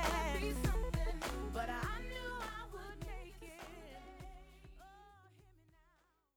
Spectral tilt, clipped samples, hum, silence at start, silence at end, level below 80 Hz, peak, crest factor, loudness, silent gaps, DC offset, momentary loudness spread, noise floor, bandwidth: -5 dB/octave; under 0.1%; none; 0 s; 0.85 s; -46 dBFS; -24 dBFS; 20 dB; -42 LUFS; none; under 0.1%; 21 LU; -74 dBFS; 19.5 kHz